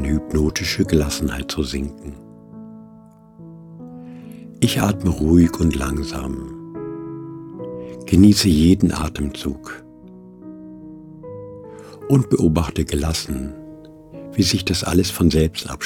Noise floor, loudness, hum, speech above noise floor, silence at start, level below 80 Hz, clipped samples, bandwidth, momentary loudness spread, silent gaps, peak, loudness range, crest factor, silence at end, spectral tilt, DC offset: -45 dBFS; -19 LUFS; none; 28 dB; 0 s; -32 dBFS; under 0.1%; 18 kHz; 24 LU; none; -2 dBFS; 8 LU; 20 dB; 0 s; -5.5 dB/octave; under 0.1%